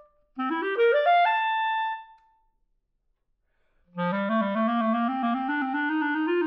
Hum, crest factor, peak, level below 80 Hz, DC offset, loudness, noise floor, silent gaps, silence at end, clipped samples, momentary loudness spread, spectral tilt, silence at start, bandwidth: none; 14 dB; -12 dBFS; -72 dBFS; under 0.1%; -25 LUFS; -74 dBFS; none; 0 s; under 0.1%; 11 LU; -8 dB/octave; 0.35 s; 5.6 kHz